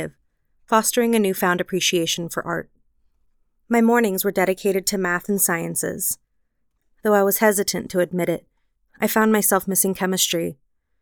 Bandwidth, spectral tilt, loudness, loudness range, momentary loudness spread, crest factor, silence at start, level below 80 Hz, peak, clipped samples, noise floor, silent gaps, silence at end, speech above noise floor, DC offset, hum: over 20 kHz; -3.5 dB/octave; -20 LUFS; 2 LU; 9 LU; 18 dB; 0 s; -58 dBFS; -4 dBFS; under 0.1%; -71 dBFS; none; 0.5 s; 51 dB; under 0.1%; none